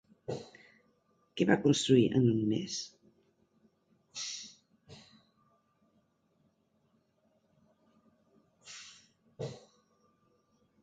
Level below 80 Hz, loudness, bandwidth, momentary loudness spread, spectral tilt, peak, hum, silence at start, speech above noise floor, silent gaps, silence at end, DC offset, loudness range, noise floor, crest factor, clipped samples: -70 dBFS; -31 LUFS; 9.4 kHz; 23 LU; -5.5 dB/octave; -12 dBFS; none; 0.3 s; 46 dB; none; 1.25 s; under 0.1%; 20 LU; -74 dBFS; 24 dB; under 0.1%